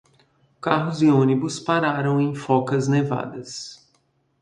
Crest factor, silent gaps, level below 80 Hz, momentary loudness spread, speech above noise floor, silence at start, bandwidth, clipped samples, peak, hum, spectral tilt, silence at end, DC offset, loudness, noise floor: 20 dB; none; -64 dBFS; 15 LU; 45 dB; 0.65 s; 10.5 kHz; under 0.1%; -2 dBFS; none; -6.5 dB/octave; 0.65 s; under 0.1%; -21 LUFS; -66 dBFS